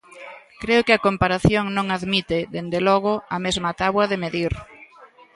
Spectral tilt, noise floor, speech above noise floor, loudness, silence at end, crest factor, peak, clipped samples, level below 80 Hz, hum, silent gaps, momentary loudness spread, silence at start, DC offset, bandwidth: -5.5 dB/octave; -49 dBFS; 28 dB; -21 LUFS; 0.3 s; 20 dB; -2 dBFS; under 0.1%; -42 dBFS; none; none; 12 LU; 0.15 s; under 0.1%; 11.5 kHz